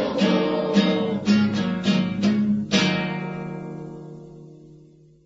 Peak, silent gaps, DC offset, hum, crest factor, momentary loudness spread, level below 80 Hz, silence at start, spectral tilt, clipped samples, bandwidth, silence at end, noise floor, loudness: -6 dBFS; none; under 0.1%; none; 18 dB; 16 LU; -58 dBFS; 0 s; -6 dB/octave; under 0.1%; 8 kHz; 0.5 s; -51 dBFS; -22 LUFS